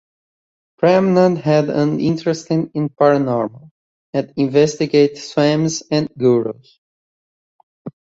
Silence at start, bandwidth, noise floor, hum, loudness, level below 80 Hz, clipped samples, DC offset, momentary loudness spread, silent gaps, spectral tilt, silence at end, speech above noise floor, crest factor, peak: 0.8 s; 8 kHz; under -90 dBFS; none; -17 LUFS; -58 dBFS; under 0.1%; under 0.1%; 10 LU; 3.71-4.13 s, 6.78-7.85 s; -6.5 dB/octave; 0.2 s; over 74 dB; 16 dB; -2 dBFS